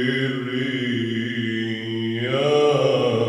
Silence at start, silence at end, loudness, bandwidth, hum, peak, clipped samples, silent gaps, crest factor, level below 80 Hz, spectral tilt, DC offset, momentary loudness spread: 0 s; 0 s; -22 LUFS; 11.5 kHz; none; -6 dBFS; under 0.1%; none; 14 dB; -68 dBFS; -6 dB/octave; under 0.1%; 8 LU